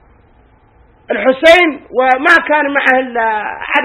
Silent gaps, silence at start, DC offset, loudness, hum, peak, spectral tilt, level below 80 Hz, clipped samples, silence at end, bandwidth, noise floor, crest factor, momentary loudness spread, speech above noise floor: none; 1.1 s; under 0.1%; -11 LUFS; none; 0 dBFS; -3 dB/octave; -48 dBFS; 0.7%; 0 s; 16 kHz; -47 dBFS; 12 dB; 8 LU; 36 dB